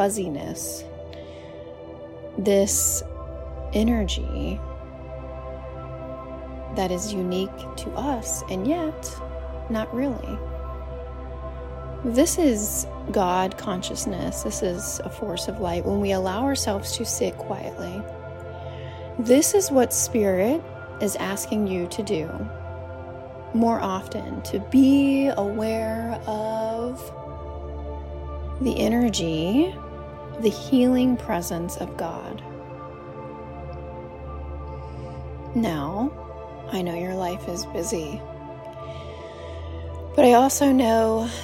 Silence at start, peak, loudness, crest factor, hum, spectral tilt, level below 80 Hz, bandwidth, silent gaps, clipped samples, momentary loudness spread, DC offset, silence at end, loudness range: 0 s; -4 dBFS; -24 LUFS; 22 dB; none; -4.5 dB/octave; -40 dBFS; 16.5 kHz; none; under 0.1%; 18 LU; under 0.1%; 0 s; 8 LU